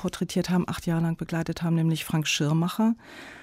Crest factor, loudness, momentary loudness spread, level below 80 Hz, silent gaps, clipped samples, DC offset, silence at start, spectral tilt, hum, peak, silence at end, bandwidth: 12 dB; -26 LUFS; 6 LU; -54 dBFS; none; under 0.1%; under 0.1%; 0 s; -5.5 dB/octave; none; -14 dBFS; 0 s; 16 kHz